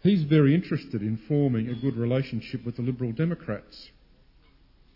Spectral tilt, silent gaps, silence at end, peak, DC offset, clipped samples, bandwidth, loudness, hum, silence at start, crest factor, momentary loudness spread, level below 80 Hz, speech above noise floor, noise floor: -10 dB/octave; none; 1.1 s; -10 dBFS; under 0.1%; under 0.1%; 5.8 kHz; -26 LUFS; none; 0.05 s; 18 dB; 14 LU; -56 dBFS; 32 dB; -58 dBFS